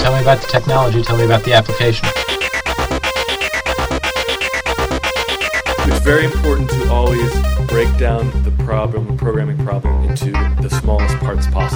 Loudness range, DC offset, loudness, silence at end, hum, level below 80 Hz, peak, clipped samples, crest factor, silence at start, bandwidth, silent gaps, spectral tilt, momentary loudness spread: 2 LU; under 0.1%; -16 LUFS; 0 s; none; -20 dBFS; 0 dBFS; under 0.1%; 14 dB; 0 s; over 20 kHz; none; -5.5 dB/octave; 5 LU